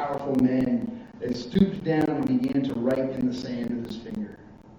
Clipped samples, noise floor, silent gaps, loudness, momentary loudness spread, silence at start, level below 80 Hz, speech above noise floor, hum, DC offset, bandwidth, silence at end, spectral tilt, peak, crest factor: under 0.1%; -46 dBFS; none; -26 LUFS; 12 LU; 0 s; -54 dBFS; 22 dB; none; under 0.1%; 7.6 kHz; 0 s; -8 dB/octave; -8 dBFS; 18 dB